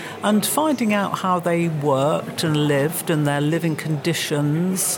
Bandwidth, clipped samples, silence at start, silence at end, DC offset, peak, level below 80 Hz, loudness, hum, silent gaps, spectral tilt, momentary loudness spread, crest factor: 17.5 kHz; under 0.1%; 0 s; 0 s; under 0.1%; -6 dBFS; -68 dBFS; -20 LUFS; none; none; -5 dB/octave; 3 LU; 14 dB